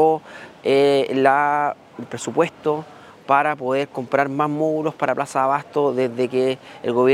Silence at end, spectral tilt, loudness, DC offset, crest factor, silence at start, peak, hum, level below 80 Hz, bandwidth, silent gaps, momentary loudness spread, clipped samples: 0 s; -5.5 dB/octave; -20 LUFS; under 0.1%; 20 dB; 0 s; 0 dBFS; none; -70 dBFS; 13 kHz; none; 11 LU; under 0.1%